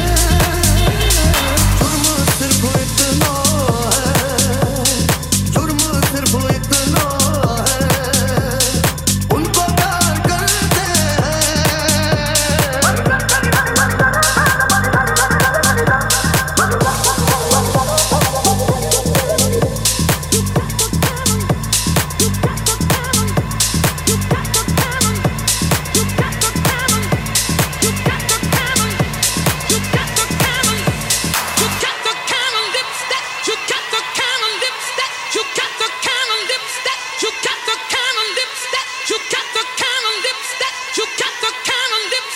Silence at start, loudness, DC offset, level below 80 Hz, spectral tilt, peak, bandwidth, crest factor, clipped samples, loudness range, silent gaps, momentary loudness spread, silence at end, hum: 0 s; -15 LUFS; under 0.1%; -28 dBFS; -3 dB/octave; 0 dBFS; 17 kHz; 16 dB; under 0.1%; 4 LU; none; 5 LU; 0 s; none